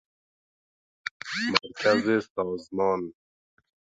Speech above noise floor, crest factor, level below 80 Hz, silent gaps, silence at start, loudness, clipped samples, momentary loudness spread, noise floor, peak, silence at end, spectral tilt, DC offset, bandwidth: over 64 dB; 28 dB; -66 dBFS; 1.11-1.20 s, 2.30-2.35 s; 1.05 s; -27 LUFS; under 0.1%; 14 LU; under -90 dBFS; -2 dBFS; 0.9 s; -4.5 dB/octave; under 0.1%; 9.2 kHz